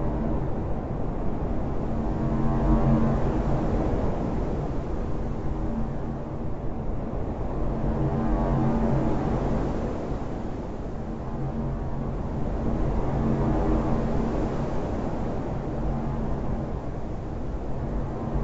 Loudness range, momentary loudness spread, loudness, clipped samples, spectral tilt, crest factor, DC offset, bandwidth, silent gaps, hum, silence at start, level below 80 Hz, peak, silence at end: 5 LU; 8 LU; -29 LUFS; under 0.1%; -9.5 dB/octave; 16 dB; under 0.1%; 7.8 kHz; none; none; 0 s; -32 dBFS; -10 dBFS; 0 s